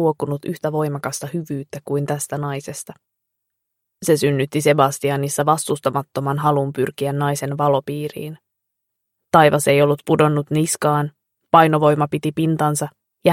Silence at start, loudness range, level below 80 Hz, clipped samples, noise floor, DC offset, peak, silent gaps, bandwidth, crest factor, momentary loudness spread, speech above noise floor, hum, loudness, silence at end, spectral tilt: 0 s; 8 LU; -60 dBFS; under 0.1%; -78 dBFS; under 0.1%; 0 dBFS; none; 16.5 kHz; 18 dB; 13 LU; 59 dB; none; -19 LUFS; 0 s; -5.5 dB/octave